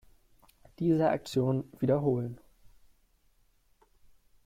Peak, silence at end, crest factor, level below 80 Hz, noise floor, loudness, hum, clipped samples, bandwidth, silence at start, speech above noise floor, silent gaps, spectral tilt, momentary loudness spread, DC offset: -16 dBFS; 2.1 s; 16 dB; -62 dBFS; -67 dBFS; -30 LUFS; none; under 0.1%; 15.5 kHz; 0.8 s; 39 dB; none; -8 dB/octave; 8 LU; under 0.1%